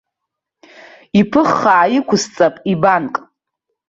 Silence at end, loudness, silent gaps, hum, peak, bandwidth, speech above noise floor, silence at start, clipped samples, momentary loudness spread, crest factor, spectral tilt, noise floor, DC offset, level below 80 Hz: 0.7 s; -14 LUFS; none; none; -2 dBFS; 7.8 kHz; 66 dB; 1.15 s; under 0.1%; 6 LU; 16 dB; -5.5 dB/octave; -80 dBFS; under 0.1%; -54 dBFS